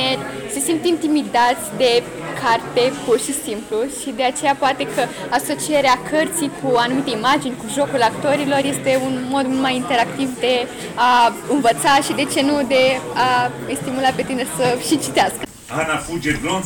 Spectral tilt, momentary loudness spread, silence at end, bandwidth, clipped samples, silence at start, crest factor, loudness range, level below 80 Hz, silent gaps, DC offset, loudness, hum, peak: -3.5 dB/octave; 7 LU; 0 s; 19 kHz; under 0.1%; 0 s; 10 dB; 3 LU; -50 dBFS; none; under 0.1%; -18 LUFS; none; -8 dBFS